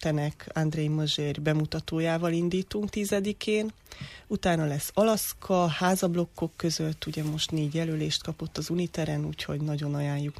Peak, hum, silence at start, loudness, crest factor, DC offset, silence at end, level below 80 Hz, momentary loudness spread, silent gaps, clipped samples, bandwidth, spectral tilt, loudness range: -12 dBFS; none; 0 s; -29 LUFS; 16 dB; under 0.1%; 0 s; -54 dBFS; 7 LU; none; under 0.1%; 15 kHz; -5.5 dB/octave; 3 LU